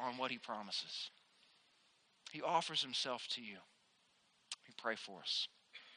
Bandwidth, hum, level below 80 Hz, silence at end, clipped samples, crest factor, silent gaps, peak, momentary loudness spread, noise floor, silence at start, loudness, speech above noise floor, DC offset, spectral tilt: 10 kHz; none; under -90 dBFS; 0 s; under 0.1%; 24 dB; none; -22 dBFS; 15 LU; -75 dBFS; 0 s; -42 LUFS; 32 dB; under 0.1%; -2 dB/octave